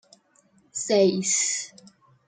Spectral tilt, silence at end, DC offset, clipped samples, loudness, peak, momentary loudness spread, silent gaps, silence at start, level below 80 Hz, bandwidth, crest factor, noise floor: -3 dB/octave; 0.6 s; under 0.1%; under 0.1%; -23 LUFS; -8 dBFS; 15 LU; none; 0.75 s; -76 dBFS; 9.6 kHz; 18 dB; -62 dBFS